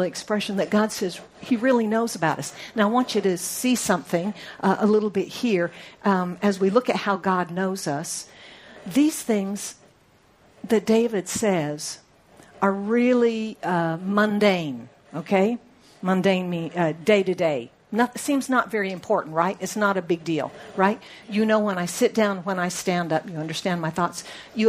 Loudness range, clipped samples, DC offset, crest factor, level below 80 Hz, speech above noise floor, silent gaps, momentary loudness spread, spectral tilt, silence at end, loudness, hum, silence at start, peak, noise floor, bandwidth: 3 LU; under 0.1%; under 0.1%; 20 dB; -66 dBFS; 35 dB; none; 10 LU; -5 dB/octave; 0 s; -24 LUFS; none; 0 s; -4 dBFS; -58 dBFS; 15.5 kHz